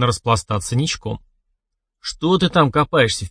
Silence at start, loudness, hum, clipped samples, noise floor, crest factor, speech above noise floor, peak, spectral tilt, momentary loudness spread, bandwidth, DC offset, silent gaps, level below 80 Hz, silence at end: 0 s; -18 LUFS; none; under 0.1%; -76 dBFS; 18 dB; 58 dB; 0 dBFS; -5 dB/octave; 15 LU; 10.5 kHz; under 0.1%; none; -42 dBFS; 0 s